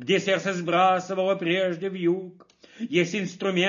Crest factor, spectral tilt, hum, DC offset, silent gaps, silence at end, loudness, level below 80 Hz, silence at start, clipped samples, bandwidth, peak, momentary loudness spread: 18 dB; -5 dB/octave; none; under 0.1%; none; 0 s; -25 LUFS; -76 dBFS; 0 s; under 0.1%; 7.4 kHz; -8 dBFS; 7 LU